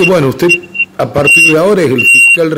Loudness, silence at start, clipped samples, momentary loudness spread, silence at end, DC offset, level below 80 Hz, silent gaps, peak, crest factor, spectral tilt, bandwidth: -6 LUFS; 0 s; under 0.1%; 9 LU; 0 s; under 0.1%; -44 dBFS; none; -2 dBFS; 6 dB; -3.5 dB/octave; 16.5 kHz